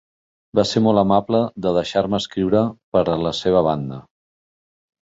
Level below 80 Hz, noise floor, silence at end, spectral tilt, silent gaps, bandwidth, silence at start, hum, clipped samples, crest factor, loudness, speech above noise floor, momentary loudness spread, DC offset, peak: -48 dBFS; under -90 dBFS; 1.05 s; -6.5 dB/octave; 2.84-2.92 s; 8 kHz; 0.55 s; none; under 0.1%; 18 dB; -19 LUFS; over 71 dB; 6 LU; under 0.1%; -2 dBFS